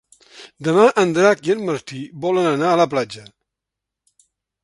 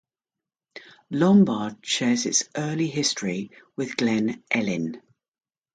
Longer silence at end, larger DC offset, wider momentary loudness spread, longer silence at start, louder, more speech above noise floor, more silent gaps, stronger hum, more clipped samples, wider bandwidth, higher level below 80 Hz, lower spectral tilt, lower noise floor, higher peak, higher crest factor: first, 1.4 s vs 0.75 s; neither; about the same, 13 LU vs 14 LU; second, 0.4 s vs 0.75 s; first, -18 LUFS vs -24 LUFS; about the same, 66 dB vs 66 dB; neither; neither; neither; first, 11.5 kHz vs 9.4 kHz; about the same, -64 dBFS vs -68 dBFS; first, -5.5 dB/octave vs -4 dB/octave; second, -84 dBFS vs -89 dBFS; first, 0 dBFS vs -8 dBFS; about the same, 20 dB vs 18 dB